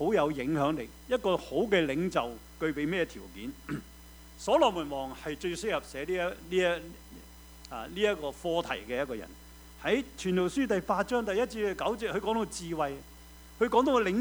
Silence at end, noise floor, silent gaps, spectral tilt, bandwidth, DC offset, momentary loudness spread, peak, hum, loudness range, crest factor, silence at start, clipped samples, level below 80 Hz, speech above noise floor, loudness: 0 s; -51 dBFS; none; -5 dB/octave; over 20 kHz; under 0.1%; 20 LU; -12 dBFS; none; 3 LU; 20 dB; 0 s; under 0.1%; -52 dBFS; 21 dB; -31 LUFS